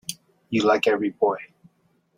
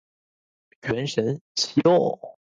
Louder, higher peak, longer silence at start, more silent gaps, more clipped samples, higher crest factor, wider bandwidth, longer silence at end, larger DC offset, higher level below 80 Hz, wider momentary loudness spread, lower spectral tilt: about the same, -23 LUFS vs -23 LUFS; about the same, -6 dBFS vs -6 dBFS; second, 0.1 s vs 0.85 s; second, none vs 1.41-1.55 s; neither; about the same, 18 dB vs 18 dB; first, 16 kHz vs 9.4 kHz; first, 0.7 s vs 0.25 s; neither; about the same, -66 dBFS vs -62 dBFS; about the same, 15 LU vs 13 LU; about the same, -4.5 dB/octave vs -5 dB/octave